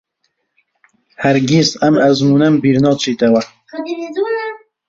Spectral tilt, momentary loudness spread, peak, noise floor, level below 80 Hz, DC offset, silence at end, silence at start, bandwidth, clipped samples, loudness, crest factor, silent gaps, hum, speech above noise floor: -5.5 dB/octave; 13 LU; -2 dBFS; -68 dBFS; -54 dBFS; under 0.1%; 0.3 s; 1.2 s; 7.8 kHz; under 0.1%; -14 LUFS; 14 dB; none; none; 55 dB